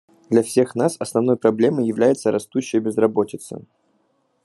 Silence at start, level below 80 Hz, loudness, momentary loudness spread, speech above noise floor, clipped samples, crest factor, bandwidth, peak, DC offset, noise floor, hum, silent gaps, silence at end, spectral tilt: 0.3 s; -68 dBFS; -20 LUFS; 8 LU; 46 dB; under 0.1%; 18 dB; 12.5 kHz; -2 dBFS; under 0.1%; -66 dBFS; none; none; 0.85 s; -6 dB/octave